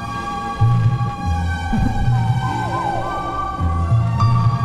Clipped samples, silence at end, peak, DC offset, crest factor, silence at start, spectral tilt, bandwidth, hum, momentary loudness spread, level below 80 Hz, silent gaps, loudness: under 0.1%; 0 s; -4 dBFS; under 0.1%; 14 dB; 0 s; -7.5 dB/octave; 9.8 kHz; none; 7 LU; -28 dBFS; none; -19 LUFS